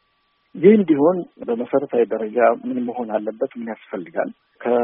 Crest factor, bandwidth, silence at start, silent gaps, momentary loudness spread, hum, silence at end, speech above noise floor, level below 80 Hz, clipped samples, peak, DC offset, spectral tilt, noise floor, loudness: 18 dB; 3.7 kHz; 0.55 s; none; 15 LU; none; 0 s; 46 dB; -70 dBFS; under 0.1%; 0 dBFS; under 0.1%; -7 dB/octave; -66 dBFS; -20 LUFS